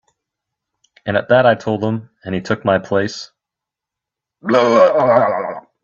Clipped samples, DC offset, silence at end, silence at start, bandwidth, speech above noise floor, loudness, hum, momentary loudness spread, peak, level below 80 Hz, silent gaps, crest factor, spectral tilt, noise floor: under 0.1%; under 0.1%; 0.25 s; 1.05 s; 7.4 kHz; 69 dB; -16 LUFS; none; 16 LU; 0 dBFS; -56 dBFS; none; 16 dB; -6 dB/octave; -84 dBFS